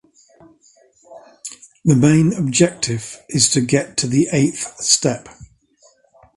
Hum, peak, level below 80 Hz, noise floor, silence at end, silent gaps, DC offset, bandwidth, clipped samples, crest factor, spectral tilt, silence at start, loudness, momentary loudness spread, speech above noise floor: none; 0 dBFS; -50 dBFS; -55 dBFS; 0.9 s; none; under 0.1%; 11.5 kHz; under 0.1%; 20 dB; -4.5 dB/octave; 1.1 s; -16 LUFS; 16 LU; 39 dB